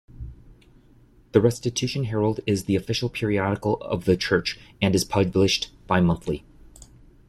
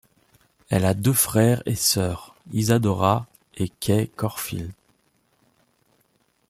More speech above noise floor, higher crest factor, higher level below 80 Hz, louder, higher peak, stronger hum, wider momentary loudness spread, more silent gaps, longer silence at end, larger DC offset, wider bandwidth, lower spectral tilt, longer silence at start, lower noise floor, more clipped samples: second, 31 dB vs 45 dB; about the same, 22 dB vs 22 dB; first, -46 dBFS vs -54 dBFS; about the same, -24 LUFS vs -22 LUFS; about the same, -4 dBFS vs -4 dBFS; neither; second, 8 LU vs 12 LU; neither; second, 0.45 s vs 1.75 s; neither; second, 14.5 kHz vs 16 kHz; about the same, -5.5 dB/octave vs -5 dB/octave; second, 0.15 s vs 0.7 s; second, -54 dBFS vs -66 dBFS; neither